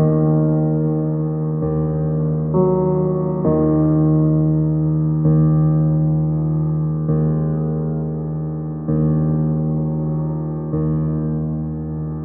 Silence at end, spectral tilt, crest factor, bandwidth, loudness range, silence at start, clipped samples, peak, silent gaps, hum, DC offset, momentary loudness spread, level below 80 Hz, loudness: 0 s; -16 dB/octave; 14 dB; 2 kHz; 4 LU; 0 s; under 0.1%; -4 dBFS; none; none; under 0.1%; 8 LU; -40 dBFS; -19 LUFS